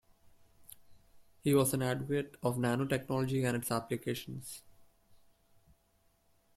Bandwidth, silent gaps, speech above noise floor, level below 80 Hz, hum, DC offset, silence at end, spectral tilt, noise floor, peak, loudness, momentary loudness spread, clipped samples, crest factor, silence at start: 16 kHz; none; 39 dB; -66 dBFS; none; under 0.1%; 1.75 s; -5.5 dB/octave; -72 dBFS; -16 dBFS; -34 LUFS; 13 LU; under 0.1%; 20 dB; 0.6 s